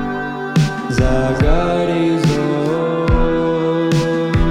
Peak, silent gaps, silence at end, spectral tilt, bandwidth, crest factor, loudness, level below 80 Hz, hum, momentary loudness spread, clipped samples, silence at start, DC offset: -2 dBFS; none; 0 s; -7 dB/octave; 12.5 kHz; 14 dB; -17 LUFS; -22 dBFS; none; 2 LU; under 0.1%; 0 s; under 0.1%